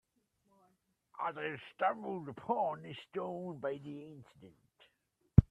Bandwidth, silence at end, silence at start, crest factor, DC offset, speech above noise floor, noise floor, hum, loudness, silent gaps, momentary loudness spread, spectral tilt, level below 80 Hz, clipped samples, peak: 4.4 kHz; 0.05 s; 1.2 s; 30 dB; under 0.1%; 39 dB; -79 dBFS; none; -37 LUFS; none; 16 LU; -9.5 dB/octave; -48 dBFS; under 0.1%; -6 dBFS